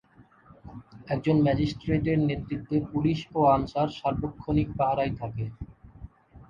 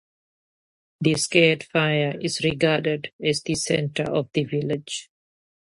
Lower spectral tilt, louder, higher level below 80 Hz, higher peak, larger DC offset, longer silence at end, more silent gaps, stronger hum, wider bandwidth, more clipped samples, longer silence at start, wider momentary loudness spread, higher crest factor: first, -8.5 dB/octave vs -4.5 dB/octave; second, -27 LUFS vs -23 LUFS; first, -46 dBFS vs -58 dBFS; second, -10 dBFS vs -4 dBFS; neither; second, 0.05 s vs 0.7 s; second, none vs 3.13-3.19 s; neither; second, 7.4 kHz vs 11.5 kHz; neither; second, 0.65 s vs 1 s; first, 20 LU vs 9 LU; about the same, 18 dB vs 20 dB